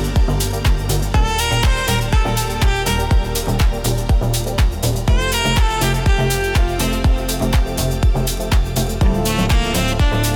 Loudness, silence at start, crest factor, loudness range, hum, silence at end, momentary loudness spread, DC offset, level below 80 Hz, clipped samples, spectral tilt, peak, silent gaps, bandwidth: -18 LUFS; 0 s; 10 dB; 1 LU; none; 0 s; 3 LU; under 0.1%; -18 dBFS; under 0.1%; -4.5 dB/octave; -6 dBFS; none; 19 kHz